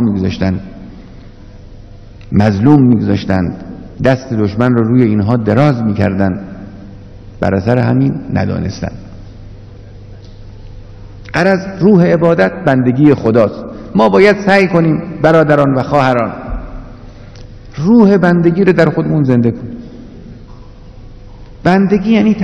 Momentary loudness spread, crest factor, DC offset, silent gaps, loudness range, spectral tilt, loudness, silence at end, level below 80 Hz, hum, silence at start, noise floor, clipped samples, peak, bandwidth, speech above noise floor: 19 LU; 12 dB; under 0.1%; none; 7 LU; -8.5 dB/octave; -11 LUFS; 0 s; -34 dBFS; none; 0 s; -33 dBFS; 0.8%; 0 dBFS; 8.8 kHz; 23 dB